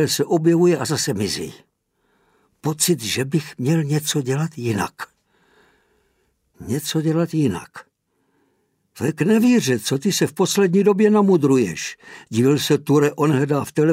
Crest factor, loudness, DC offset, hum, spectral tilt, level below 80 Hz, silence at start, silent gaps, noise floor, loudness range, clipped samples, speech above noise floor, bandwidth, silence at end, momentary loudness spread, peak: 16 dB; -19 LUFS; under 0.1%; none; -5 dB/octave; -60 dBFS; 0 s; none; -68 dBFS; 8 LU; under 0.1%; 49 dB; 16 kHz; 0 s; 12 LU; -4 dBFS